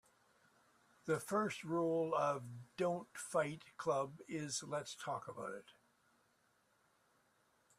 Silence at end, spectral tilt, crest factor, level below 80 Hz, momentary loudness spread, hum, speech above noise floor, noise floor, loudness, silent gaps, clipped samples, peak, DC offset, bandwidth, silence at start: 2.05 s; -4.5 dB/octave; 20 dB; -82 dBFS; 11 LU; none; 36 dB; -77 dBFS; -41 LUFS; none; under 0.1%; -24 dBFS; under 0.1%; 15 kHz; 1.05 s